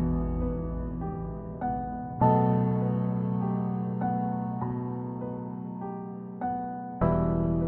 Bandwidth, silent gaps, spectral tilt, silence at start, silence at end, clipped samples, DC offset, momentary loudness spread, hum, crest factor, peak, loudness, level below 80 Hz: 3.3 kHz; none; -13 dB/octave; 0 s; 0 s; under 0.1%; under 0.1%; 12 LU; none; 20 dB; -10 dBFS; -30 LUFS; -40 dBFS